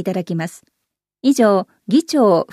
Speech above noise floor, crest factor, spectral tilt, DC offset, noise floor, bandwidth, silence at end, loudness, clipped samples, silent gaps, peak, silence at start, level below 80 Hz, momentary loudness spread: 37 dB; 14 dB; -6 dB/octave; under 0.1%; -53 dBFS; 14 kHz; 0.1 s; -17 LUFS; under 0.1%; none; -2 dBFS; 0 s; -70 dBFS; 10 LU